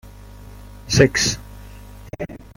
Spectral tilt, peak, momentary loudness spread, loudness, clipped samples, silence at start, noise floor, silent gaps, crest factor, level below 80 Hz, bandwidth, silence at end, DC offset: -4 dB/octave; -2 dBFS; 26 LU; -18 LUFS; under 0.1%; 0.05 s; -40 dBFS; none; 22 dB; -40 dBFS; 16.5 kHz; 0.2 s; under 0.1%